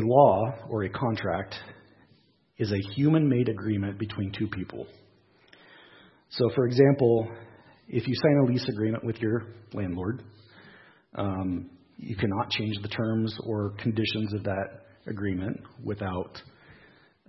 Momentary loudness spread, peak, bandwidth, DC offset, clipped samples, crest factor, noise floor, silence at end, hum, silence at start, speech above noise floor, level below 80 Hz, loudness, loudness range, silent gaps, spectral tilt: 17 LU; -6 dBFS; 6 kHz; under 0.1%; under 0.1%; 22 dB; -63 dBFS; 0.55 s; none; 0 s; 37 dB; -64 dBFS; -28 LUFS; 7 LU; none; -9 dB/octave